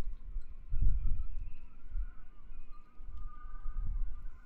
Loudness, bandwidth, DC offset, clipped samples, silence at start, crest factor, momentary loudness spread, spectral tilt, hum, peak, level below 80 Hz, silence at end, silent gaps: -44 LUFS; 1.6 kHz; under 0.1%; under 0.1%; 0 s; 16 dB; 19 LU; -9 dB/octave; none; -16 dBFS; -36 dBFS; 0 s; none